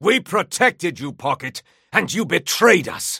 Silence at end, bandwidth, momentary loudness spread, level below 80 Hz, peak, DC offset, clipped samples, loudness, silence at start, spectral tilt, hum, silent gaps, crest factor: 0 s; 16.5 kHz; 12 LU; -64 dBFS; 0 dBFS; under 0.1%; under 0.1%; -19 LUFS; 0 s; -3 dB/octave; none; none; 20 dB